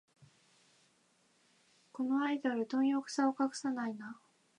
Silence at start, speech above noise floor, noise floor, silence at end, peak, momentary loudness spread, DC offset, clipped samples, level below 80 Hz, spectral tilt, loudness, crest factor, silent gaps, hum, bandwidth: 0.2 s; 38 dB; -72 dBFS; 0.45 s; -20 dBFS; 16 LU; under 0.1%; under 0.1%; under -90 dBFS; -4 dB/octave; -35 LUFS; 18 dB; none; none; 10 kHz